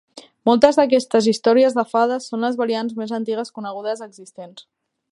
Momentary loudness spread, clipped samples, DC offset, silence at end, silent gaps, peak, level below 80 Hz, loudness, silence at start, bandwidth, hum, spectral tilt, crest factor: 21 LU; under 0.1%; under 0.1%; 0.55 s; none; 0 dBFS; -62 dBFS; -19 LUFS; 0.15 s; 11.5 kHz; none; -4.5 dB/octave; 20 dB